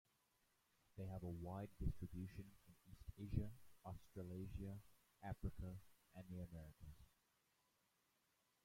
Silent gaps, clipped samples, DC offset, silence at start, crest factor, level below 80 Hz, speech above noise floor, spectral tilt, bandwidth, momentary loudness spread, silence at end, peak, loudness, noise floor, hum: none; under 0.1%; under 0.1%; 0.95 s; 24 dB; -60 dBFS; 33 dB; -8 dB/octave; 16.5 kHz; 15 LU; 1.6 s; -30 dBFS; -54 LUFS; -84 dBFS; none